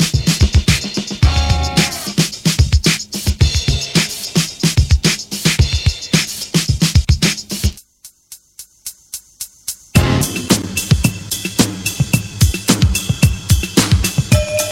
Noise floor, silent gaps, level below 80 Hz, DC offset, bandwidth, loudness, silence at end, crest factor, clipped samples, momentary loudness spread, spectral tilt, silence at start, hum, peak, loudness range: -44 dBFS; none; -22 dBFS; under 0.1%; 16.5 kHz; -15 LUFS; 0 s; 16 dB; under 0.1%; 8 LU; -4 dB/octave; 0 s; none; 0 dBFS; 5 LU